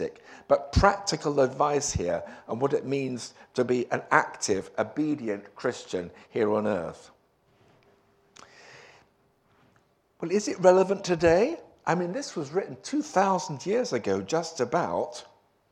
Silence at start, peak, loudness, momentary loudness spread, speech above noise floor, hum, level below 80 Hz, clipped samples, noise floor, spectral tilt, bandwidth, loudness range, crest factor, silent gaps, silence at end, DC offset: 0 s; -4 dBFS; -27 LUFS; 12 LU; 39 dB; none; -46 dBFS; under 0.1%; -66 dBFS; -5 dB/octave; 11 kHz; 8 LU; 24 dB; none; 0.5 s; under 0.1%